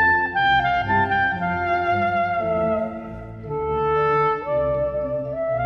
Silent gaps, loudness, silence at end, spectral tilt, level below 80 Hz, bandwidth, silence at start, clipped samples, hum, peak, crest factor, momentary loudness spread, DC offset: none; -21 LUFS; 0 s; -7.5 dB/octave; -44 dBFS; 6.8 kHz; 0 s; under 0.1%; none; -8 dBFS; 14 dB; 9 LU; under 0.1%